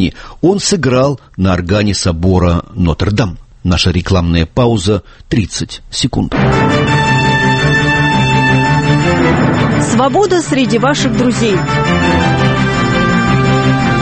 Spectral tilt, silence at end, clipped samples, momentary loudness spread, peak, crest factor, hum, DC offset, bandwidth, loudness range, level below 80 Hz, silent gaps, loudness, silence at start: -5.5 dB/octave; 0 s; under 0.1%; 5 LU; 0 dBFS; 12 dB; none; under 0.1%; 8.8 kHz; 3 LU; -28 dBFS; none; -12 LUFS; 0 s